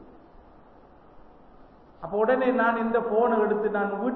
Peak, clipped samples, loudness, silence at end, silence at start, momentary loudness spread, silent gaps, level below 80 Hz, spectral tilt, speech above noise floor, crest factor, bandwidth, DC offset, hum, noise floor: -10 dBFS; under 0.1%; -24 LUFS; 0 s; 0 s; 4 LU; none; -60 dBFS; -9.5 dB/octave; 29 dB; 16 dB; 4.3 kHz; under 0.1%; none; -53 dBFS